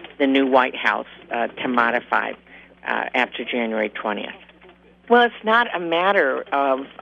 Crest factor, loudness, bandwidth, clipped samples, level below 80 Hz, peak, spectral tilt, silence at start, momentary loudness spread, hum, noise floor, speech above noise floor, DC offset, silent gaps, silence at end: 18 dB; -20 LUFS; 7.6 kHz; under 0.1%; -64 dBFS; -2 dBFS; -5.5 dB/octave; 0 s; 10 LU; 60 Hz at -60 dBFS; -50 dBFS; 29 dB; under 0.1%; none; 0.1 s